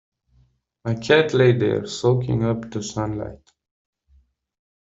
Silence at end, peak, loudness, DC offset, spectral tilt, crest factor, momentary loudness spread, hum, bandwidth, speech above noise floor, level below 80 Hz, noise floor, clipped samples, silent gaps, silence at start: 1.55 s; -4 dBFS; -21 LUFS; under 0.1%; -6 dB/octave; 20 dB; 12 LU; none; 7.8 kHz; 41 dB; -50 dBFS; -61 dBFS; under 0.1%; none; 0.85 s